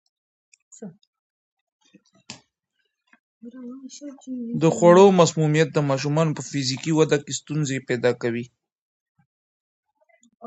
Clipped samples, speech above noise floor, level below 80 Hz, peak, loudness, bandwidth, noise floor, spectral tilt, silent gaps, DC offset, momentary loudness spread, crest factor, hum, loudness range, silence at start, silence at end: under 0.1%; 56 dB; -68 dBFS; -2 dBFS; -20 LUFS; 8.4 kHz; -76 dBFS; -5.5 dB/octave; 1.07-1.13 s, 1.19-1.79 s, 3.19-3.41 s, 8.78-9.15 s, 9.26-9.83 s, 10.35-10.40 s; under 0.1%; 27 LU; 22 dB; none; 10 LU; 0.8 s; 0 s